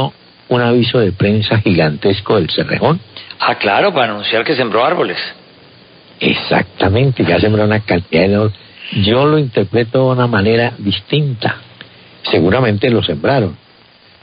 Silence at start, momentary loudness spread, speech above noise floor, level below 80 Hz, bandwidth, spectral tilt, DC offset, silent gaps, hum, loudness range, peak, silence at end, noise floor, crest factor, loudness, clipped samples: 0 s; 7 LU; 33 dB; -38 dBFS; 5.2 kHz; -11.5 dB/octave; under 0.1%; none; none; 2 LU; 0 dBFS; 0.65 s; -45 dBFS; 14 dB; -14 LUFS; under 0.1%